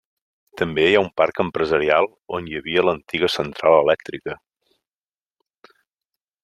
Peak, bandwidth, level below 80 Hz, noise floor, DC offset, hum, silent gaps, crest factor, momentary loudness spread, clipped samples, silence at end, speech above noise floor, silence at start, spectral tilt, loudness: -2 dBFS; 12.5 kHz; -56 dBFS; under -90 dBFS; under 0.1%; none; none; 20 dB; 13 LU; under 0.1%; 2.1 s; over 70 dB; 0.55 s; -5.5 dB/octave; -20 LUFS